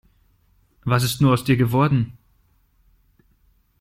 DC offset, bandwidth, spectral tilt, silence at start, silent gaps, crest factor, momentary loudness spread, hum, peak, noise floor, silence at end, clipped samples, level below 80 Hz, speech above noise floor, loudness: under 0.1%; 16 kHz; -6.5 dB/octave; 0.85 s; none; 20 dB; 9 LU; none; -4 dBFS; -61 dBFS; 1.7 s; under 0.1%; -50 dBFS; 43 dB; -20 LUFS